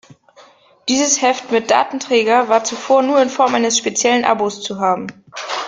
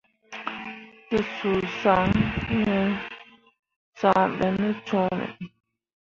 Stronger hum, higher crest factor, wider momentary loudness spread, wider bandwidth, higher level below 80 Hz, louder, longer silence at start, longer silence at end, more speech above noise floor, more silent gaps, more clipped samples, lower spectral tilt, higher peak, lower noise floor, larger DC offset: neither; about the same, 16 dB vs 20 dB; second, 8 LU vs 18 LU; first, 10 kHz vs 7.2 kHz; second, -62 dBFS vs -48 dBFS; first, -15 LUFS vs -25 LUFS; about the same, 0.4 s vs 0.3 s; second, 0 s vs 0.65 s; first, 32 dB vs 23 dB; second, none vs 3.59-3.63 s, 3.76-3.93 s; neither; second, -2 dB/octave vs -7 dB/octave; first, -2 dBFS vs -6 dBFS; about the same, -47 dBFS vs -47 dBFS; neither